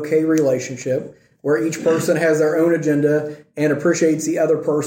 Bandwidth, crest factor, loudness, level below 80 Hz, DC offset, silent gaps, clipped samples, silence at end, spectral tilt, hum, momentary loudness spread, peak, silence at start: 16.5 kHz; 14 dB; -18 LUFS; -64 dBFS; under 0.1%; none; under 0.1%; 0 s; -6 dB/octave; none; 7 LU; -4 dBFS; 0 s